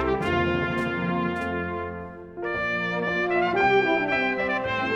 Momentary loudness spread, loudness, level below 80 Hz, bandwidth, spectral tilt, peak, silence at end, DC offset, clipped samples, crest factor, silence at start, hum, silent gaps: 11 LU; -25 LUFS; -48 dBFS; 10 kHz; -6.5 dB/octave; -10 dBFS; 0 s; under 0.1%; under 0.1%; 16 dB; 0 s; none; none